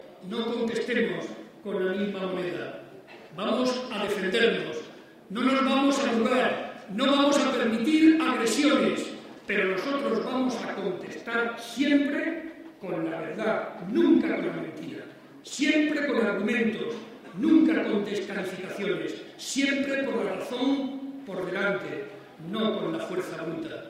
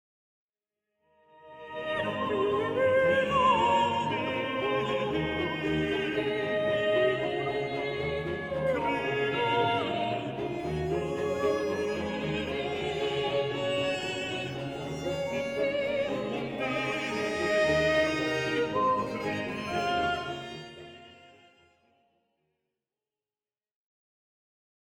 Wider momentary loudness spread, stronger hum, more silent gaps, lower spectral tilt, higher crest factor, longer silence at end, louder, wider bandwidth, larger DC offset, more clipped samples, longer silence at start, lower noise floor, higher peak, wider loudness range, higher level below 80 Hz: first, 15 LU vs 9 LU; neither; neither; about the same, -4.5 dB/octave vs -5.5 dB/octave; about the same, 18 dB vs 18 dB; second, 0 s vs 3.7 s; about the same, -27 LUFS vs -29 LUFS; about the same, 15 kHz vs 16.5 kHz; neither; neither; second, 0.05 s vs 1.45 s; second, -47 dBFS vs under -90 dBFS; first, -8 dBFS vs -12 dBFS; about the same, 7 LU vs 5 LU; second, -70 dBFS vs -56 dBFS